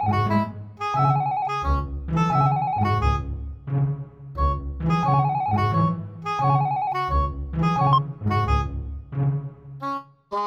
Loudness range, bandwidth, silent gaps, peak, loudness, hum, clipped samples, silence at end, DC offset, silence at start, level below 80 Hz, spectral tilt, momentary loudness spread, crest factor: 2 LU; 7.4 kHz; none; -6 dBFS; -24 LUFS; none; under 0.1%; 0 s; under 0.1%; 0 s; -34 dBFS; -8 dB/octave; 11 LU; 16 dB